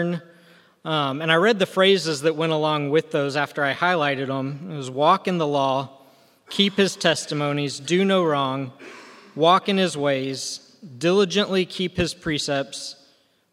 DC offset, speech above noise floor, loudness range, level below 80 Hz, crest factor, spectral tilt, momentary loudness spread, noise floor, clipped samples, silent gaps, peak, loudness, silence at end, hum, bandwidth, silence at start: under 0.1%; 38 dB; 2 LU; -58 dBFS; 20 dB; -4.5 dB/octave; 13 LU; -60 dBFS; under 0.1%; none; -2 dBFS; -22 LUFS; 0.6 s; none; 14.5 kHz; 0 s